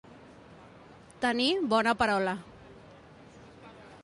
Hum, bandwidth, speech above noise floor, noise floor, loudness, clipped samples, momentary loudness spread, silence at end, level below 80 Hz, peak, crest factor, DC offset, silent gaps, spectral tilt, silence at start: none; 11.5 kHz; 26 dB; -53 dBFS; -28 LUFS; under 0.1%; 25 LU; 0.05 s; -60 dBFS; -12 dBFS; 20 dB; under 0.1%; none; -4.5 dB/octave; 0.1 s